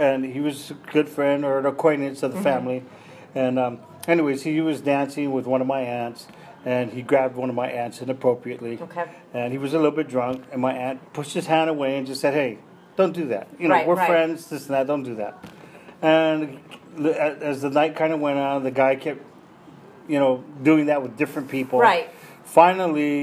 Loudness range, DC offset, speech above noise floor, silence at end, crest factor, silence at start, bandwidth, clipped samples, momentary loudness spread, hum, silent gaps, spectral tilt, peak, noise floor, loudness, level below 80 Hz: 4 LU; under 0.1%; 25 dB; 0 s; 22 dB; 0 s; 15 kHz; under 0.1%; 13 LU; none; none; -6 dB/octave; -2 dBFS; -47 dBFS; -23 LUFS; -74 dBFS